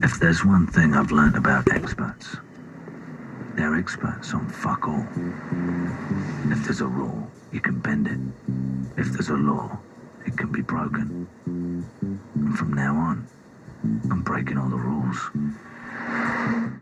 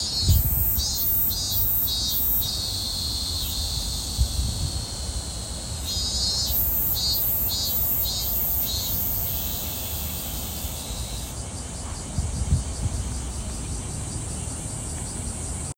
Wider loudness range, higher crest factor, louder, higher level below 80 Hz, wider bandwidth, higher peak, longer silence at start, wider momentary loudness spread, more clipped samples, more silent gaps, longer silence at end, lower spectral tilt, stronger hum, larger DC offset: about the same, 6 LU vs 8 LU; about the same, 22 dB vs 18 dB; about the same, -25 LUFS vs -24 LUFS; second, -46 dBFS vs -34 dBFS; second, 10.5 kHz vs 17 kHz; first, -2 dBFS vs -8 dBFS; about the same, 0 s vs 0 s; first, 17 LU vs 11 LU; neither; neither; about the same, 0 s vs 0.05 s; first, -7 dB/octave vs -3 dB/octave; neither; neither